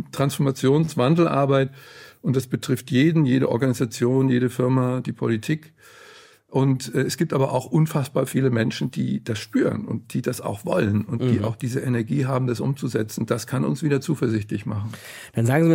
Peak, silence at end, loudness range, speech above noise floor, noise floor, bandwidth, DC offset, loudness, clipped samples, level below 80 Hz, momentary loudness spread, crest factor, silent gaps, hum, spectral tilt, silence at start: -6 dBFS; 0 s; 3 LU; 27 dB; -49 dBFS; 17 kHz; under 0.1%; -23 LUFS; under 0.1%; -62 dBFS; 9 LU; 16 dB; none; none; -7 dB/octave; 0 s